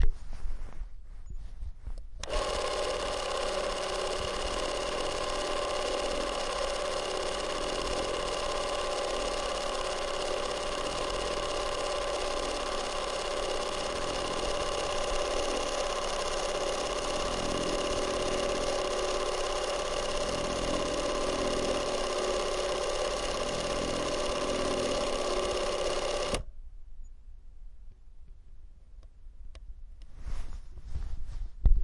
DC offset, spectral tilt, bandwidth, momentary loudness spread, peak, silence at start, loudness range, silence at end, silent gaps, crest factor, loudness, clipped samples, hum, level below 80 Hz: under 0.1%; -3 dB/octave; 11.5 kHz; 14 LU; -10 dBFS; 0 s; 5 LU; 0 s; none; 22 dB; -32 LUFS; under 0.1%; none; -38 dBFS